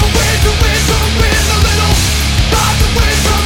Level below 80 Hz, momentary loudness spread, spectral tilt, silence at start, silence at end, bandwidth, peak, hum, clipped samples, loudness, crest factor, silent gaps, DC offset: -14 dBFS; 1 LU; -3.5 dB/octave; 0 s; 0 s; 17 kHz; 0 dBFS; none; under 0.1%; -11 LUFS; 10 dB; none; under 0.1%